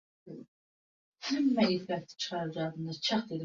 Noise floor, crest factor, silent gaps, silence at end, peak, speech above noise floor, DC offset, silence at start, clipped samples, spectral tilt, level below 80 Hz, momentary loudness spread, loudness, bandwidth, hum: under -90 dBFS; 18 dB; 0.48-1.12 s; 0 s; -16 dBFS; over 58 dB; under 0.1%; 0.25 s; under 0.1%; -5 dB/octave; -76 dBFS; 22 LU; -32 LUFS; 7.6 kHz; none